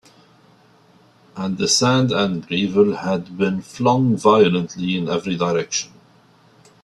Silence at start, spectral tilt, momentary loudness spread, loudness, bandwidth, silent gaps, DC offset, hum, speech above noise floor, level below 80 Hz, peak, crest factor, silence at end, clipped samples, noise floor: 1.35 s; -4.5 dB/octave; 9 LU; -19 LUFS; 12.5 kHz; none; under 0.1%; none; 34 dB; -58 dBFS; 0 dBFS; 20 dB; 1 s; under 0.1%; -53 dBFS